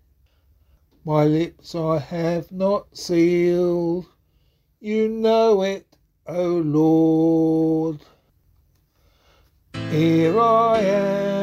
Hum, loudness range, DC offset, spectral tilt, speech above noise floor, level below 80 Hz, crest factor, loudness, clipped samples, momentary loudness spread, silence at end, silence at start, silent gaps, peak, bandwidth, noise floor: none; 3 LU; under 0.1%; -7.5 dB/octave; 43 dB; -56 dBFS; 16 dB; -20 LUFS; under 0.1%; 11 LU; 0 s; 1.05 s; none; -6 dBFS; 12 kHz; -62 dBFS